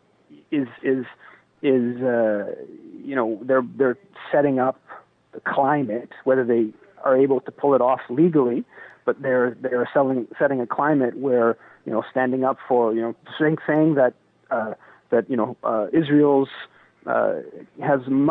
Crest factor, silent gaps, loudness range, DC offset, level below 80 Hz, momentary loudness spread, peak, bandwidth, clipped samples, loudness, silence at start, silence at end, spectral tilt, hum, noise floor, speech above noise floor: 14 dB; none; 3 LU; under 0.1%; -72 dBFS; 11 LU; -8 dBFS; 4.1 kHz; under 0.1%; -22 LUFS; 0.5 s; 0 s; -10.5 dB/octave; none; -52 dBFS; 31 dB